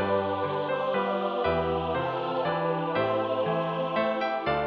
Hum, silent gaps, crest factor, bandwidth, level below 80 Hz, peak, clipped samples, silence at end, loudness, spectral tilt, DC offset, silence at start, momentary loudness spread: none; none; 14 dB; 6 kHz; -54 dBFS; -14 dBFS; under 0.1%; 0 s; -28 LUFS; -8 dB/octave; under 0.1%; 0 s; 2 LU